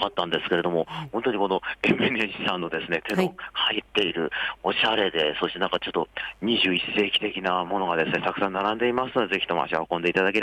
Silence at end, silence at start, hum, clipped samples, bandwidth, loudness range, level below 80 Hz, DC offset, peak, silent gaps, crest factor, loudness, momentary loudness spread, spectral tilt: 0 s; 0 s; none; under 0.1%; 15 kHz; 1 LU; -58 dBFS; under 0.1%; -10 dBFS; none; 16 dB; -25 LUFS; 6 LU; -5.5 dB/octave